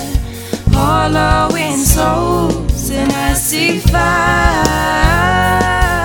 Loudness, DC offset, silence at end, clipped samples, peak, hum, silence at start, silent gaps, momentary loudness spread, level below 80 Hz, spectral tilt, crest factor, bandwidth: -13 LUFS; 0.1%; 0 s; under 0.1%; 0 dBFS; none; 0 s; none; 5 LU; -20 dBFS; -4.5 dB/octave; 12 dB; over 20 kHz